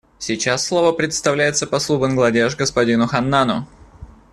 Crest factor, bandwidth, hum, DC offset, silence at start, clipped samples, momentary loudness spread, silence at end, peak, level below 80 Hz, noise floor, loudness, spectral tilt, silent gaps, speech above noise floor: 16 dB; 12.5 kHz; none; under 0.1%; 0.2 s; under 0.1%; 4 LU; 0.3 s; -2 dBFS; -48 dBFS; -41 dBFS; -18 LUFS; -4 dB/octave; none; 23 dB